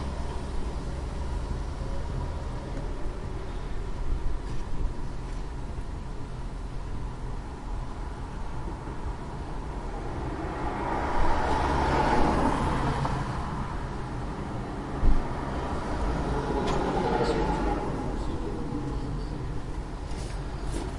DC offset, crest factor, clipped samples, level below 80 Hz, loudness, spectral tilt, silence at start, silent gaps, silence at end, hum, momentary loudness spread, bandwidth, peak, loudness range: under 0.1%; 20 dB; under 0.1%; -32 dBFS; -32 LUFS; -6.5 dB/octave; 0 s; none; 0 s; none; 11 LU; 11.5 kHz; -8 dBFS; 10 LU